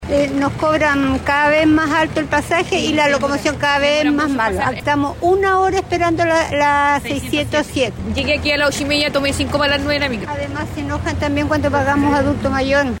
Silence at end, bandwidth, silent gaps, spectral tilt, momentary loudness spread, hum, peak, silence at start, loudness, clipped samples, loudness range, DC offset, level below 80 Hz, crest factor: 0 s; 16.5 kHz; none; -5 dB/octave; 6 LU; none; -4 dBFS; 0 s; -16 LUFS; under 0.1%; 2 LU; under 0.1%; -34 dBFS; 12 dB